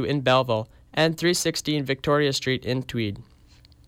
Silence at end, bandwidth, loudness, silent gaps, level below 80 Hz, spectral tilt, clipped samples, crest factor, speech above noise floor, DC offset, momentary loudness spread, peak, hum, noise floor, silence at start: 0.65 s; 16.5 kHz; -24 LUFS; none; -54 dBFS; -4.5 dB/octave; under 0.1%; 16 dB; 29 dB; under 0.1%; 8 LU; -8 dBFS; none; -53 dBFS; 0 s